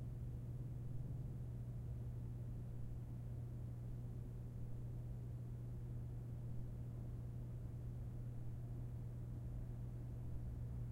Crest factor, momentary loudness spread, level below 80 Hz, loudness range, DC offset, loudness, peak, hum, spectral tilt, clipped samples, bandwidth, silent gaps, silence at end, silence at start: 14 dB; 2 LU; -54 dBFS; 1 LU; under 0.1%; -50 LUFS; -34 dBFS; 60 Hz at -50 dBFS; -9.5 dB/octave; under 0.1%; 3.8 kHz; none; 0 s; 0 s